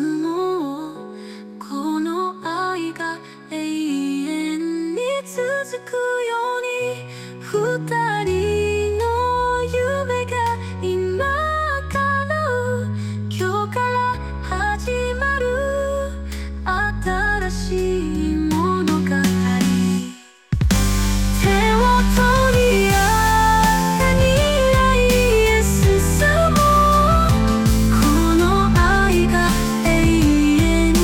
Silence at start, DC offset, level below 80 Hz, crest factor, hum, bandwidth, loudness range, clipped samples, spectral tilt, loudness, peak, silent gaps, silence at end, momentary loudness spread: 0 s; under 0.1%; -26 dBFS; 12 dB; none; 17.5 kHz; 9 LU; under 0.1%; -5 dB/octave; -19 LUFS; -6 dBFS; none; 0 s; 11 LU